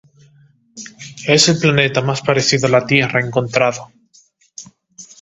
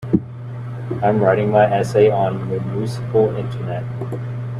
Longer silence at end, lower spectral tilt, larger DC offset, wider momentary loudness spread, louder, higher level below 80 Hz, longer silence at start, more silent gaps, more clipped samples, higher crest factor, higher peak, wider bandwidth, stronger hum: first, 0.2 s vs 0 s; second, -4 dB/octave vs -8 dB/octave; neither; first, 23 LU vs 12 LU; first, -14 LUFS vs -19 LUFS; about the same, -54 dBFS vs -50 dBFS; first, 0.75 s vs 0 s; neither; neither; about the same, 18 dB vs 18 dB; about the same, 0 dBFS vs -2 dBFS; second, 8.4 kHz vs 11.5 kHz; neither